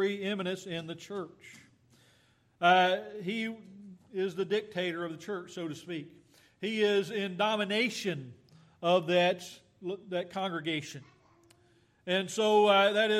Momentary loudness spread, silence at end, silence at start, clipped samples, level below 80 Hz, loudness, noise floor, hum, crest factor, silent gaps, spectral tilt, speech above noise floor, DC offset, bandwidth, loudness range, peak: 17 LU; 0 s; 0 s; under 0.1%; -80 dBFS; -31 LUFS; -67 dBFS; none; 20 dB; none; -4.5 dB/octave; 36 dB; under 0.1%; 14.5 kHz; 6 LU; -12 dBFS